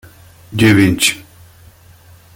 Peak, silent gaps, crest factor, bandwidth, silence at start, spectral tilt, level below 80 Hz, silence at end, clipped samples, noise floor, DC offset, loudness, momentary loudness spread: 0 dBFS; none; 16 dB; 17 kHz; 0.5 s; -4.5 dB/octave; -44 dBFS; 1.15 s; under 0.1%; -43 dBFS; under 0.1%; -12 LUFS; 16 LU